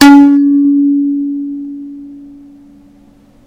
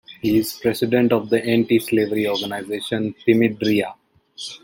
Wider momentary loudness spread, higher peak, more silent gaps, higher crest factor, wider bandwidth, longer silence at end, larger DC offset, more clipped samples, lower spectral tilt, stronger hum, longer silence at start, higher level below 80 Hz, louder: first, 23 LU vs 9 LU; about the same, 0 dBFS vs -2 dBFS; neither; second, 10 dB vs 18 dB; second, 12 kHz vs 17 kHz; first, 1.2 s vs 0.05 s; neither; first, 2% vs under 0.1%; second, -3.5 dB/octave vs -5.5 dB/octave; neither; about the same, 0 s vs 0.1 s; first, -46 dBFS vs -58 dBFS; first, -9 LUFS vs -20 LUFS